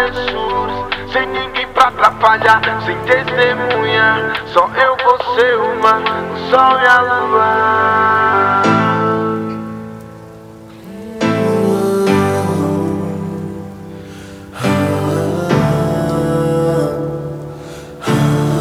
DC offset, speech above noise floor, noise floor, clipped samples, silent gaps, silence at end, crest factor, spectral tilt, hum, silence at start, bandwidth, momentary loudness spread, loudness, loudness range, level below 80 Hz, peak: under 0.1%; 22 dB; -35 dBFS; 0.2%; none; 0 s; 14 dB; -6 dB/octave; none; 0 s; 16.5 kHz; 17 LU; -14 LUFS; 6 LU; -42 dBFS; 0 dBFS